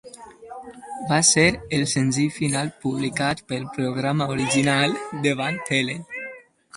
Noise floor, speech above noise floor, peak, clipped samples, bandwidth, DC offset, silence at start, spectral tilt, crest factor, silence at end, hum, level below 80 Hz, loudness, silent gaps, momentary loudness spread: -43 dBFS; 20 dB; -2 dBFS; under 0.1%; 11.5 kHz; under 0.1%; 0.05 s; -3.5 dB/octave; 20 dB; 0 s; none; -54 dBFS; -22 LUFS; none; 19 LU